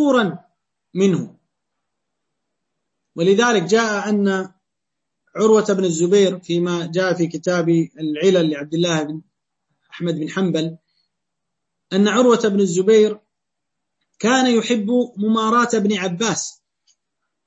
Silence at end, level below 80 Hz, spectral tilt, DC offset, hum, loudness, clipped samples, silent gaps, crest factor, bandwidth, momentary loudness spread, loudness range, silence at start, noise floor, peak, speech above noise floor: 0.95 s; -68 dBFS; -5 dB/octave; under 0.1%; none; -18 LUFS; under 0.1%; none; 16 dB; 8.4 kHz; 10 LU; 5 LU; 0 s; -82 dBFS; -4 dBFS; 64 dB